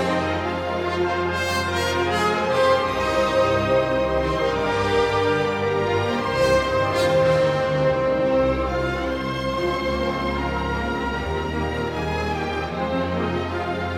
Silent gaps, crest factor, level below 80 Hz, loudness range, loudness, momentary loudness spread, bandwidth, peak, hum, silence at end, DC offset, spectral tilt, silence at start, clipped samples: none; 14 dB; -38 dBFS; 5 LU; -22 LUFS; 6 LU; 15.5 kHz; -8 dBFS; none; 0 s; under 0.1%; -5.5 dB/octave; 0 s; under 0.1%